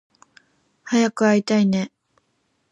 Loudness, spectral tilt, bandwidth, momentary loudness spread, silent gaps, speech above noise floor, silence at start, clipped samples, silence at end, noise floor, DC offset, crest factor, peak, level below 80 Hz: -20 LUFS; -5.5 dB/octave; 10.5 kHz; 7 LU; none; 51 dB; 0.85 s; under 0.1%; 0.85 s; -69 dBFS; under 0.1%; 16 dB; -6 dBFS; -68 dBFS